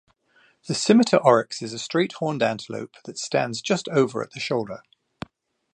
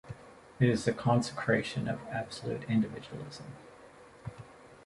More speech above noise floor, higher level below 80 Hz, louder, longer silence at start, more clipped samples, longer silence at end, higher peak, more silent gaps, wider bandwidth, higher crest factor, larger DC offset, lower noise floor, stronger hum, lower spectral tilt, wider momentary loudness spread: first, 38 dB vs 23 dB; about the same, -66 dBFS vs -62 dBFS; first, -23 LUFS vs -32 LUFS; first, 0.65 s vs 0.05 s; neither; first, 0.95 s vs 0 s; first, -2 dBFS vs -12 dBFS; neither; second, 10 kHz vs 11.5 kHz; about the same, 22 dB vs 20 dB; neither; first, -61 dBFS vs -54 dBFS; neither; second, -4.5 dB/octave vs -6.5 dB/octave; about the same, 20 LU vs 21 LU